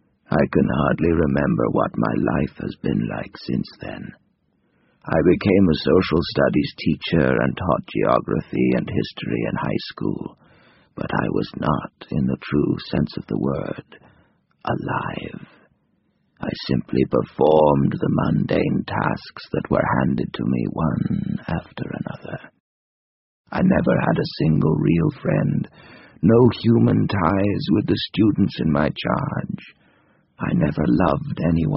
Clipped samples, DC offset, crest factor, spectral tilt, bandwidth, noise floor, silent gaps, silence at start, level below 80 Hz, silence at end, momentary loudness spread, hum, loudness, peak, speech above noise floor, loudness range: under 0.1%; under 0.1%; 20 dB; -6.5 dB/octave; 5.8 kHz; -66 dBFS; 22.60-23.45 s; 0.3 s; -42 dBFS; 0 s; 13 LU; none; -21 LUFS; -2 dBFS; 46 dB; 7 LU